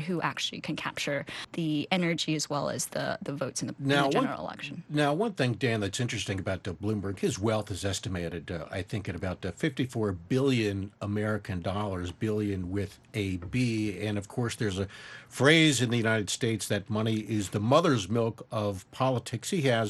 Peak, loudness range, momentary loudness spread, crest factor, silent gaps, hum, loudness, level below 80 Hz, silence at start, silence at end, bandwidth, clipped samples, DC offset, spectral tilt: -6 dBFS; 5 LU; 10 LU; 24 dB; none; none; -30 LUFS; -60 dBFS; 0 s; 0 s; 12.5 kHz; under 0.1%; under 0.1%; -5 dB/octave